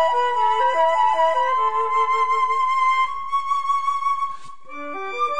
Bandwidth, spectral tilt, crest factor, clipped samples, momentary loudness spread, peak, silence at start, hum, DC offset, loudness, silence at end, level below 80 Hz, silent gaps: 10 kHz; -2 dB/octave; 12 dB; under 0.1%; 11 LU; -8 dBFS; 0 s; none; 2%; -20 LUFS; 0 s; -62 dBFS; none